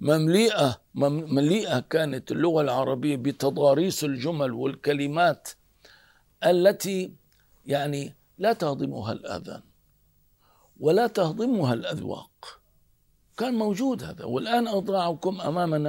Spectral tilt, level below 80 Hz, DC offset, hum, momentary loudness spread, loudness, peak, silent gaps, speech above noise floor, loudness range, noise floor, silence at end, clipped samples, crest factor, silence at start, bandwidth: -5.5 dB/octave; -66 dBFS; under 0.1%; none; 14 LU; -25 LUFS; -6 dBFS; none; 39 dB; 5 LU; -64 dBFS; 0 s; under 0.1%; 18 dB; 0 s; 16 kHz